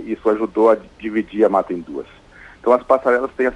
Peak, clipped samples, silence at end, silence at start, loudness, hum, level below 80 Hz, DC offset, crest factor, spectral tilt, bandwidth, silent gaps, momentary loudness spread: -2 dBFS; under 0.1%; 0 s; 0 s; -18 LUFS; none; -52 dBFS; under 0.1%; 16 dB; -7 dB/octave; 10.5 kHz; none; 11 LU